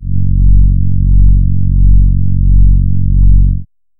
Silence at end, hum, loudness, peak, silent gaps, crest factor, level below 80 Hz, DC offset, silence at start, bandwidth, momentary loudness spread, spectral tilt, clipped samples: 0.35 s; none; -12 LUFS; 0 dBFS; none; 6 dB; -10 dBFS; under 0.1%; 0 s; 0.4 kHz; 3 LU; -17 dB/octave; 0.3%